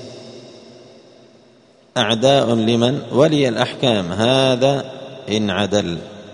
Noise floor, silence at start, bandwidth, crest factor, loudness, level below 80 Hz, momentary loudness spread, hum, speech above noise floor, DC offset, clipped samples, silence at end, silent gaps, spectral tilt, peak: -51 dBFS; 0 s; 10.5 kHz; 18 dB; -17 LUFS; -56 dBFS; 16 LU; none; 34 dB; under 0.1%; under 0.1%; 0 s; none; -5.5 dB/octave; 0 dBFS